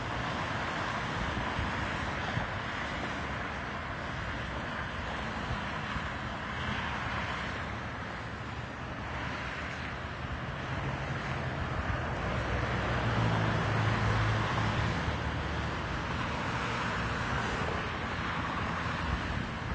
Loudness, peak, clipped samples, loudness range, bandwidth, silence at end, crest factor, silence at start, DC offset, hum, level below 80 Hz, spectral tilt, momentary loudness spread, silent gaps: -34 LUFS; -16 dBFS; under 0.1%; 6 LU; 8 kHz; 0 s; 16 dB; 0 s; under 0.1%; none; -44 dBFS; -5.5 dB/octave; 7 LU; none